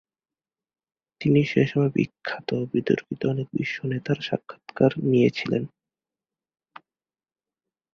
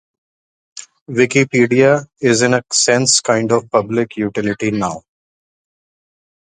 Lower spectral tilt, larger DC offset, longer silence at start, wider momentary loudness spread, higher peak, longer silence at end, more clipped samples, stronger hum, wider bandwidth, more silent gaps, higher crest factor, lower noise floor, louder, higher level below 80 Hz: first, -8 dB/octave vs -3.5 dB/octave; neither; first, 1.2 s vs 0.75 s; about the same, 9 LU vs 11 LU; second, -6 dBFS vs 0 dBFS; first, 2.25 s vs 1.5 s; neither; neither; second, 7 kHz vs 10 kHz; second, none vs 1.01-1.06 s; about the same, 20 dB vs 16 dB; about the same, under -90 dBFS vs under -90 dBFS; second, -24 LUFS vs -15 LUFS; second, -62 dBFS vs -56 dBFS